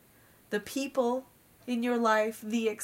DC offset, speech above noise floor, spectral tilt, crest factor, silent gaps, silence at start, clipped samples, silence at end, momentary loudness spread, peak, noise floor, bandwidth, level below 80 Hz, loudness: under 0.1%; 31 dB; -4 dB/octave; 18 dB; none; 0.5 s; under 0.1%; 0 s; 10 LU; -14 dBFS; -60 dBFS; 16 kHz; -72 dBFS; -31 LUFS